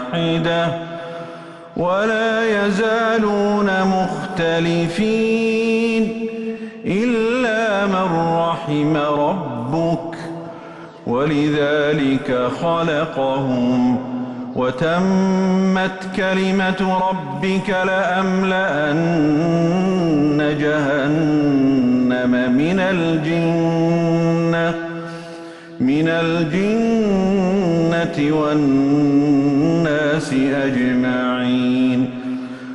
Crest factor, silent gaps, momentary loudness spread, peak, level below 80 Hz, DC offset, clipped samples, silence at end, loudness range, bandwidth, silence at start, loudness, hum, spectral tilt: 10 dB; none; 9 LU; -8 dBFS; -50 dBFS; under 0.1%; under 0.1%; 0 s; 3 LU; 11.5 kHz; 0 s; -18 LUFS; none; -7 dB/octave